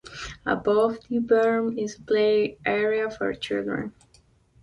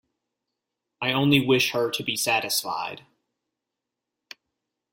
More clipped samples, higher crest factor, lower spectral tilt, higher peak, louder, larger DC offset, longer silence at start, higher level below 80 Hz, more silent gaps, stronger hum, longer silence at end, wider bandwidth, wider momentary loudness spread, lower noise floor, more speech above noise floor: neither; second, 16 dB vs 24 dB; first, -5.5 dB/octave vs -3.5 dB/octave; second, -8 dBFS vs -4 dBFS; about the same, -25 LUFS vs -23 LUFS; neither; second, 0.05 s vs 1 s; first, -56 dBFS vs -66 dBFS; neither; neither; second, 0.7 s vs 1.95 s; second, 11 kHz vs 16.5 kHz; about the same, 11 LU vs 12 LU; second, -60 dBFS vs -85 dBFS; second, 36 dB vs 62 dB